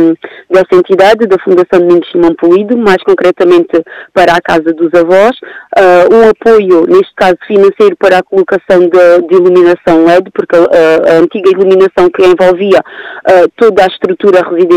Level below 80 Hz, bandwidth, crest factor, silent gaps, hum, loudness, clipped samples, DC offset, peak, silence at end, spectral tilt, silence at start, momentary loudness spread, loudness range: -42 dBFS; 10.5 kHz; 6 dB; none; none; -6 LUFS; 6%; under 0.1%; 0 dBFS; 0 s; -6 dB/octave; 0 s; 5 LU; 2 LU